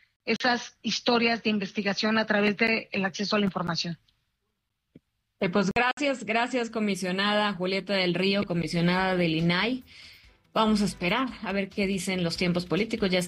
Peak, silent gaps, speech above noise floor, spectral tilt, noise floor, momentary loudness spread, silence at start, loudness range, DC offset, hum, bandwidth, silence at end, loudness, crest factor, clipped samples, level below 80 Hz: -10 dBFS; 5.93-5.97 s; 53 dB; -5 dB/octave; -80 dBFS; 6 LU; 0.25 s; 3 LU; under 0.1%; none; 12.5 kHz; 0 s; -26 LUFS; 16 dB; under 0.1%; -56 dBFS